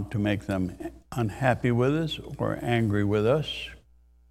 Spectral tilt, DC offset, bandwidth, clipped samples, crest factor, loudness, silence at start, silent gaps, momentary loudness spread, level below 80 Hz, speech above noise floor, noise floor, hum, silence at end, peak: -7 dB/octave; under 0.1%; 14.5 kHz; under 0.1%; 20 dB; -27 LUFS; 0 s; none; 10 LU; -50 dBFS; 32 dB; -58 dBFS; none; 0.55 s; -6 dBFS